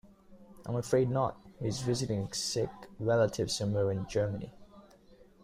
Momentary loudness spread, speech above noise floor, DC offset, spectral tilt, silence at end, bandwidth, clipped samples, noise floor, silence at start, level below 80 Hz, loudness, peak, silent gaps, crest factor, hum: 10 LU; 27 dB; under 0.1%; -5.5 dB/octave; 0.3 s; 15.5 kHz; under 0.1%; -59 dBFS; 0.05 s; -58 dBFS; -32 LUFS; -14 dBFS; none; 18 dB; none